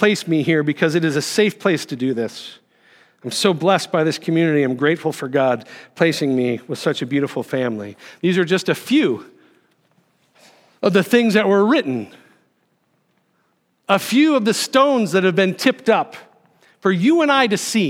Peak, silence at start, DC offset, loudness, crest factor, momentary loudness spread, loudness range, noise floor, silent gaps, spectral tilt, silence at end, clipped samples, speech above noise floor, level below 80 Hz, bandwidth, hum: 0 dBFS; 0 s; under 0.1%; -18 LUFS; 18 dB; 11 LU; 4 LU; -65 dBFS; none; -5 dB/octave; 0 s; under 0.1%; 48 dB; -74 dBFS; 16.5 kHz; none